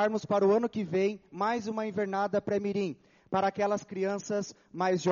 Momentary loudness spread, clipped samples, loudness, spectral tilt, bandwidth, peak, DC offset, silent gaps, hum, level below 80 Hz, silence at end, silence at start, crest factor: 7 LU; under 0.1%; -30 LUFS; -5.5 dB/octave; 7.2 kHz; -14 dBFS; under 0.1%; none; none; -72 dBFS; 0 s; 0 s; 16 dB